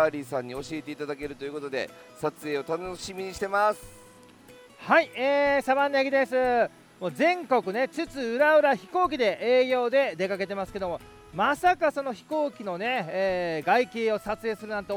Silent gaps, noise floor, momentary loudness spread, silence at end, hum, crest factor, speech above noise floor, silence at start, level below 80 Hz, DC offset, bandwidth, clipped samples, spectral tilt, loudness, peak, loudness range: none; -52 dBFS; 12 LU; 0 s; none; 20 dB; 26 dB; 0 s; -60 dBFS; under 0.1%; 19.5 kHz; under 0.1%; -4.5 dB/octave; -26 LUFS; -8 dBFS; 7 LU